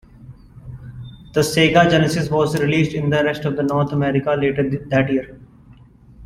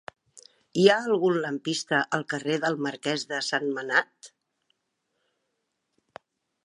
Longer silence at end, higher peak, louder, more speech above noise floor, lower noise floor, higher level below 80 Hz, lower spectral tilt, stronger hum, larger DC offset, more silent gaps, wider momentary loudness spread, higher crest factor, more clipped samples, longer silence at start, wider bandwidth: second, 0 s vs 2.35 s; about the same, -2 dBFS vs -4 dBFS; first, -18 LUFS vs -26 LUFS; second, 29 dB vs 53 dB; second, -46 dBFS vs -79 dBFS; first, -46 dBFS vs -80 dBFS; first, -6 dB/octave vs -4 dB/octave; neither; neither; neither; first, 22 LU vs 9 LU; second, 18 dB vs 24 dB; neither; second, 0.2 s vs 0.35 s; first, 14.5 kHz vs 11.5 kHz